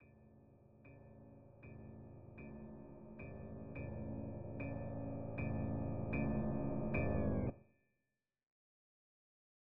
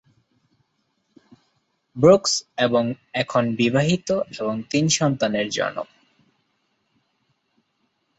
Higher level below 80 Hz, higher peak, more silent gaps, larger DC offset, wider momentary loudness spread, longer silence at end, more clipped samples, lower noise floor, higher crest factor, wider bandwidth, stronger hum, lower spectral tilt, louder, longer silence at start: about the same, -56 dBFS vs -60 dBFS; second, -24 dBFS vs -2 dBFS; first, 8.43-8.47 s vs none; neither; first, 21 LU vs 11 LU; second, 1.25 s vs 2.35 s; neither; first, under -90 dBFS vs -71 dBFS; about the same, 20 dB vs 22 dB; second, 3.8 kHz vs 8.2 kHz; neither; first, -10.5 dB/octave vs -4.5 dB/octave; second, -43 LUFS vs -21 LUFS; second, 0 s vs 1.95 s